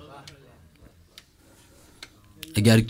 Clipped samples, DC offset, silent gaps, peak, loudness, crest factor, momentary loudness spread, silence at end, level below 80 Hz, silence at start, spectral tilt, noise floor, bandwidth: under 0.1%; under 0.1%; none; -6 dBFS; -22 LUFS; 22 dB; 29 LU; 0 s; -52 dBFS; 2.55 s; -5.5 dB/octave; -56 dBFS; 16 kHz